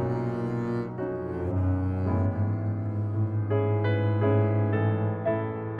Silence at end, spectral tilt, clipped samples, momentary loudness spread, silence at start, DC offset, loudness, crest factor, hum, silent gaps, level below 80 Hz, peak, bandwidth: 0 s; -10.5 dB/octave; under 0.1%; 6 LU; 0 s; under 0.1%; -27 LUFS; 12 dB; none; none; -56 dBFS; -14 dBFS; 4.3 kHz